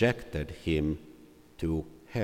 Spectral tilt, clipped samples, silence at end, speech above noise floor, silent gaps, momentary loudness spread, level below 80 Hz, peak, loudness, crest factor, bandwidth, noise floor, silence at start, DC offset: -7 dB/octave; under 0.1%; 0 s; 24 dB; none; 9 LU; -46 dBFS; -12 dBFS; -33 LUFS; 20 dB; 16.5 kHz; -54 dBFS; 0 s; under 0.1%